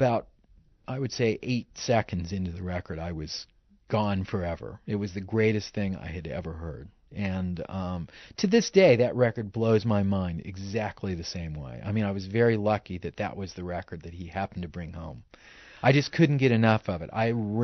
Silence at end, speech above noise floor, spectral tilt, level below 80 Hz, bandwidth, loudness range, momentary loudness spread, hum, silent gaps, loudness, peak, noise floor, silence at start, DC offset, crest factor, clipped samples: 0 s; 32 dB; -6 dB/octave; -52 dBFS; 6.4 kHz; 6 LU; 15 LU; none; none; -28 LUFS; -8 dBFS; -60 dBFS; 0 s; under 0.1%; 20 dB; under 0.1%